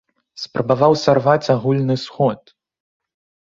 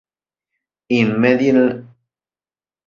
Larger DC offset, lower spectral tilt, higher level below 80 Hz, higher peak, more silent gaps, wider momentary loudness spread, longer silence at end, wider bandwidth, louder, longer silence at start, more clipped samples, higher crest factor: neither; about the same, -6.5 dB/octave vs -7.5 dB/octave; about the same, -58 dBFS vs -60 dBFS; about the same, -2 dBFS vs -2 dBFS; neither; first, 12 LU vs 7 LU; about the same, 1.1 s vs 1.05 s; about the same, 7.6 kHz vs 7.2 kHz; about the same, -17 LUFS vs -16 LUFS; second, 0.35 s vs 0.9 s; neither; about the same, 18 dB vs 18 dB